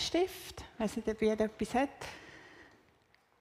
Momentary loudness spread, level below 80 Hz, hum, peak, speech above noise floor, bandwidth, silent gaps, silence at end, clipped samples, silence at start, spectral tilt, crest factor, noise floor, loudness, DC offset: 20 LU; -60 dBFS; none; -18 dBFS; 35 dB; 15.5 kHz; none; 0.75 s; under 0.1%; 0 s; -4.5 dB/octave; 18 dB; -69 dBFS; -35 LUFS; under 0.1%